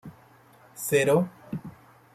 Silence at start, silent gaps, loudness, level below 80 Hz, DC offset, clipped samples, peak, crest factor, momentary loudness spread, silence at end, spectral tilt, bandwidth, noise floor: 0.05 s; none; -25 LUFS; -66 dBFS; under 0.1%; under 0.1%; -10 dBFS; 18 dB; 23 LU; 0.45 s; -5 dB/octave; 16 kHz; -55 dBFS